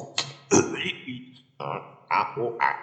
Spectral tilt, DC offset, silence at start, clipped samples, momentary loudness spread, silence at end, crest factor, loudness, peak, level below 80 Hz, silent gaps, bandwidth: -3 dB/octave; under 0.1%; 0 s; under 0.1%; 15 LU; 0 s; 24 dB; -27 LUFS; -4 dBFS; -76 dBFS; none; 9.2 kHz